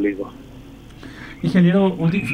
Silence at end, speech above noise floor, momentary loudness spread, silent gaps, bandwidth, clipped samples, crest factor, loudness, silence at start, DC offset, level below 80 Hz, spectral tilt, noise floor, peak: 0 s; 22 dB; 24 LU; none; 10 kHz; under 0.1%; 16 dB; -18 LUFS; 0 s; under 0.1%; -46 dBFS; -8.5 dB/octave; -40 dBFS; -4 dBFS